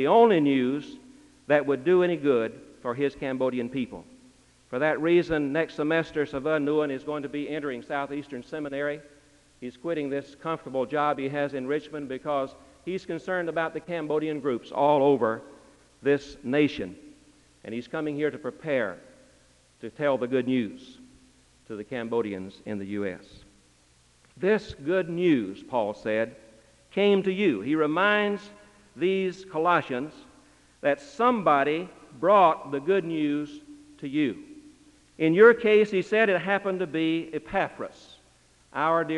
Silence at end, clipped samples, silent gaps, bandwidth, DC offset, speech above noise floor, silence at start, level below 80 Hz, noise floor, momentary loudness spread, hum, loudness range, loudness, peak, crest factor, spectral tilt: 0 s; under 0.1%; none; 11 kHz; under 0.1%; 35 dB; 0 s; -62 dBFS; -61 dBFS; 15 LU; none; 8 LU; -26 LUFS; -6 dBFS; 22 dB; -6.5 dB/octave